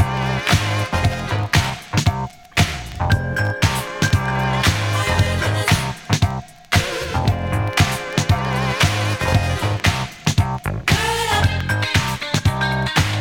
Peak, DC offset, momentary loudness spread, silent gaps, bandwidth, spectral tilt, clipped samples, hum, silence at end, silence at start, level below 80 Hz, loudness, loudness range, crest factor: -2 dBFS; under 0.1%; 4 LU; none; 17.5 kHz; -4.5 dB/octave; under 0.1%; none; 0 s; 0 s; -32 dBFS; -19 LUFS; 1 LU; 16 dB